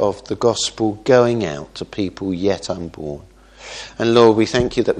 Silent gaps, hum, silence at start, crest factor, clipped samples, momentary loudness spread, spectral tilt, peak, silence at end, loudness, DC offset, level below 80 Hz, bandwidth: none; none; 0 s; 18 dB; under 0.1%; 18 LU; -5 dB/octave; 0 dBFS; 0 s; -18 LUFS; under 0.1%; -44 dBFS; 10 kHz